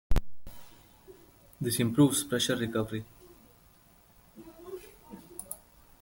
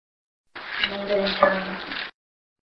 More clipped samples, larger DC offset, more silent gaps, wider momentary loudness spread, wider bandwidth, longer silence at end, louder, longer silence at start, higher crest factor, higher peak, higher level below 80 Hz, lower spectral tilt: neither; neither; neither; first, 27 LU vs 17 LU; first, 17 kHz vs 6 kHz; about the same, 0.45 s vs 0.5 s; second, -29 LUFS vs -24 LUFS; second, 0.1 s vs 0.55 s; second, 20 dB vs 26 dB; second, -12 dBFS vs -2 dBFS; first, -42 dBFS vs -58 dBFS; second, -4.5 dB/octave vs -6 dB/octave